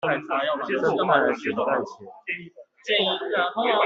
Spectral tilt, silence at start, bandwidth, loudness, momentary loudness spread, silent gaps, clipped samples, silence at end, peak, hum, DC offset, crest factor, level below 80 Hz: -5 dB/octave; 0.05 s; 7.6 kHz; -24 LUFS; 12 LU; none; under 0.1%; 0 s; -4 dBFS; none; under 0.1%; 20 dB; -70 dBFS